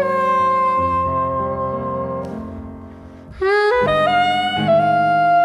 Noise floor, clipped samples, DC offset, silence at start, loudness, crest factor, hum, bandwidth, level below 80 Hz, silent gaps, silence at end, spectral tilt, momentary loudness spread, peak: -37 dBFS; under 0.1%; under 0.1%; 0 s; -17 LUFS; 12 dB; none; 11 kHz; -44 dBFS; none; 0 s; -6 dB/octave; 15 LU; -6 dBFS